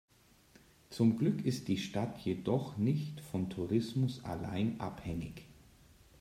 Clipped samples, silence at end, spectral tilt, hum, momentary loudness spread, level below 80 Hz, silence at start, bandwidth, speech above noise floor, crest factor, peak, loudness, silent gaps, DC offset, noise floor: under 0.1%; 0.65 s; -7 dB/octave; none; 10 LU; -62 dBFS; 0.9 s; 15.5 kHz; 30 dB; 18 dB; -18 dBFS; -35 LUFS; none; under 0.1%; -64 dBFS